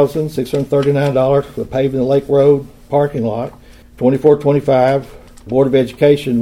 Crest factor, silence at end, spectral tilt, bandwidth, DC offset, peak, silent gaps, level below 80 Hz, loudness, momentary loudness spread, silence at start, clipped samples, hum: 14 dB; 0 s; -8 dB/octave; 15.5 kHz; under 0.1%; 0 dBFS; none; -42 dBFS; -14 LUFS; 8 LU; 0 s; under 0.1%; none